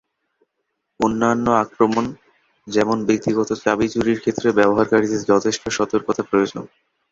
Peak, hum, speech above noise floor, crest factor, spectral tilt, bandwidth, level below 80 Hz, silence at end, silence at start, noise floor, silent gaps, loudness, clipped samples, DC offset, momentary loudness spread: 0 dBFS; none; 57 dB; 18 dB; -5 dB/octave; 7.8 kHz; -52 dBFS; 0.45 s; 1 s; -75 dBFS; none; -19 LUFS; under 0.1%; under 0.1%; 6 LU